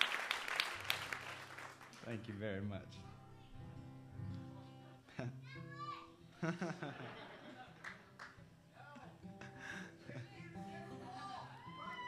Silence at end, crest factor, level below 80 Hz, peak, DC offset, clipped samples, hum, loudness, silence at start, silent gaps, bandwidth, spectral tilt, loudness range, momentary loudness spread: 0 s; 34 dB; -72 dBFS; -14 dBFS; under 0.1%; under 0.1%; none; -47 LUFS; 0 s; none; 15.5 kHz; -4 dB/octave; 9 LU; 17 LU